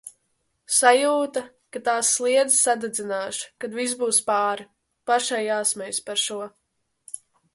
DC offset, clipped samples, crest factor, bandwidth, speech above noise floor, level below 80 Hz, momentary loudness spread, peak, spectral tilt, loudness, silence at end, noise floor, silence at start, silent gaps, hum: under 0.1%; under 0.1%; 22 dB; 12 kHz; 50 dB; -74 dBFS; 19 LU; -4 dBFS; -0.5 dB/octave; -22 LUFS; 0.4 s; -72 dBFS; 0.05 s; none; none